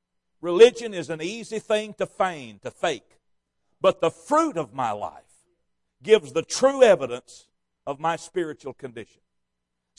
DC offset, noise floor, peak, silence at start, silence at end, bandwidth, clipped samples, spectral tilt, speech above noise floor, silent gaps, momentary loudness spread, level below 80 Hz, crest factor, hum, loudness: under 0.1%; -79 dBFS; -2 dBFS; 0.45 s; 0.95 s; 11.5 kHz; under 0.1%; -4 dB/octave; 56 dB; none; 20 LU; -66 dBFS; 22 dB; none; -23 LUFS